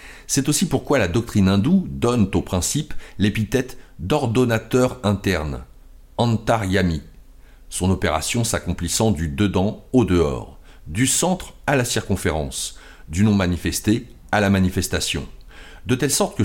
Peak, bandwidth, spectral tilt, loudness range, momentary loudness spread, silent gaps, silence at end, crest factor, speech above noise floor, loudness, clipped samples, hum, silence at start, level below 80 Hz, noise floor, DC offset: -6 dBFS; 17 kHz; -5 dB/octave; 2 LU; 10 LU; none; 0 s; 14 dB; 24 dB; -21 LUFS; under 0.1%; none; 0 s; -38 dBFS; -44 dBFS; under 0.1%